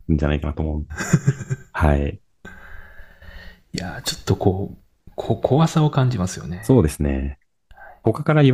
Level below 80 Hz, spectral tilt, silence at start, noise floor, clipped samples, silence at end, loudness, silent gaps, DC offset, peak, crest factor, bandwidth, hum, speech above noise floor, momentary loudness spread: -34 dBFS; -6.5 dB/octave; 0.1 s; -46 dBFS; under 0.1%; 0 s; -21 LUFS; none; under 0.1%; -2 dBFS; 20 dB; 15.5 kHz; none; 27 dB; 16 LU